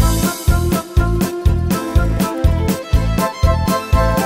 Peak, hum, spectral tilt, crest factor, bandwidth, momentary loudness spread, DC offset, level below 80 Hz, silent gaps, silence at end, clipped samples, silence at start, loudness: 0 dBFS; none; -6 dB/octave; 14 dB; 16.5 kHz; 2 LU; under 0.1%; -20 dBFS; none; 0 s; under 0.1%; 0 s; -17 LUFS